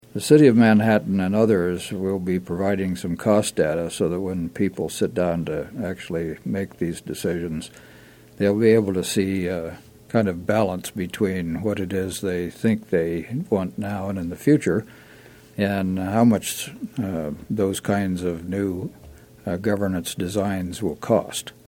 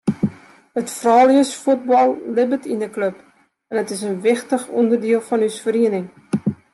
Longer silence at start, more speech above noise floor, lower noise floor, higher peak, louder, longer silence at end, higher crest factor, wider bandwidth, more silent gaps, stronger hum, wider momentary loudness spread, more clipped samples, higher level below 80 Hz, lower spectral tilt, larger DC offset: about the same, 0.15 s vs 0.05 s; first, 25 dB vs 20 dB; first, -47 dBFS vs -38 dBFS; about the same, -2 dBFS vs -2 dBFS; second, -23 LUFS vs -19 LUFS; about the same, 0.2 s vs 0.2 s; about the same, 20 dB vs 16 dB; first, 17 kHz vs 12.5 kHz; neither; neither; about the same, 11 LU vs 11 LU; neither; first, -52 dBFS vs -64 dBFS; about the same, -6 dB/octave vs -5.5 dB/octave; neither